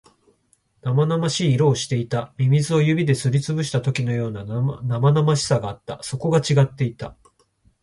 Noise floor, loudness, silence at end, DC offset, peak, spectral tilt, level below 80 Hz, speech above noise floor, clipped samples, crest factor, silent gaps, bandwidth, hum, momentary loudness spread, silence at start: -64 dBFS; -21 LUFS; 0.7 s; under 0.1%; -4 dBFS; -6 dB/octave; -54 dBFS; 44 dB; under 0.1%; 16 dB; none; 11.5 kHz; none; 9 LU; 0.85 s